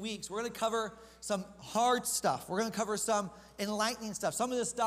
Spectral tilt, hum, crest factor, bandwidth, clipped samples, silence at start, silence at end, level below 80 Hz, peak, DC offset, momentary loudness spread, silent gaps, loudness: -3 dB/octave; none; 16 dB; 15.5 kHz; under 0.1%; 0 s; 0 s; -66 dBFS; -18 dBFS; under 0.1%; 8 LU; none; -34 LUFS